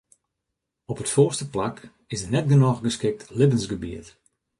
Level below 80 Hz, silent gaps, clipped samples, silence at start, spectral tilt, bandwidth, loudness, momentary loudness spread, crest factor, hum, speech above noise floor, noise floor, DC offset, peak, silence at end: -52 dBFS; none; under 0.1%; 0.9 s; -6 dB/octave; 11.5 kHz; -23 LUFS; 16 LU; 18 dB; none; 60 dB; -82 dBFS; under 0.1%; -6 dBFS; 0.5 s